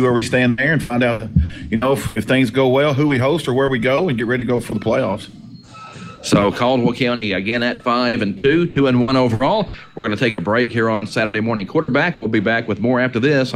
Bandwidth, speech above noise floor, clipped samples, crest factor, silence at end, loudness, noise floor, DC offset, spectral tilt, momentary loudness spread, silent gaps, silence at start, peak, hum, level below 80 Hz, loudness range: 15 kHz; 20 dB; under 0.1%; 16 dB; 0 s; -17 LUFS; -37 dBFS; under 0.1%; -6 dB/octave; 6 LU; none; 0 s; 0 dBFS; none; -40 dBFS; 2 LU